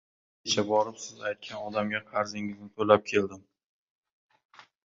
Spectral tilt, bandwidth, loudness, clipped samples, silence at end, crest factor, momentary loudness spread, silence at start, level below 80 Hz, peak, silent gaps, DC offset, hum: -4 dB/octave; 7.8 kHz; -29 LUFS; under 0.1%; 1.45 s; 26 dB; 13 LU; 0.45 s; -68 dBFS; -4 dBFS; none; under 0.1%; none